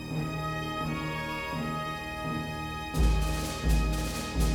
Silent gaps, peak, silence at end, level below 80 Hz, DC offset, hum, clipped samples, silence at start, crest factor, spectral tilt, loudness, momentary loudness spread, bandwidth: none; -14 dBFS; 0 s; -32 dBFS; under 0.1%; none; under 0.1%; 0 s; 16 dB; -5 dB/octave; -32 LUFS; 6 LU; 19 kHz